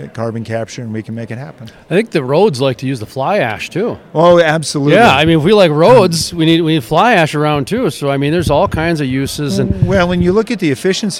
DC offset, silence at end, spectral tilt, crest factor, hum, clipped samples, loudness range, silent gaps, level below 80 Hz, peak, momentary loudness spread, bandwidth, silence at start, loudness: under 0.1%; 0 s; -5.5 dB/octave; 12 dB; none; 0.3%; 7 LU; none; -38 dBFS; 0 dBFS; 13 LU; 16 kHz; 0 s; -12 LUFS